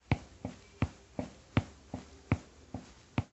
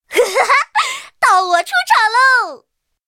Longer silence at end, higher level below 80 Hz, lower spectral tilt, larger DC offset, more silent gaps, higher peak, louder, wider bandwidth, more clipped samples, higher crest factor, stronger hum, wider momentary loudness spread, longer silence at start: second, 0.1 s vs 0.5 s; first, -50 dBFS vs -66 dBFS; first, -7 dB/octave vs 1 dB/octave; neither; neither; second, -14 dBFS vs 0 dBFS; second, -40 LUFS vs -13 LUFS; second, 8.2 kHz vs 17 kHz; neither; first, 26 dB vs 14 dB; neither; first, 13 LU vs 7 LU; about the same, 0.1 s vs 0.1 s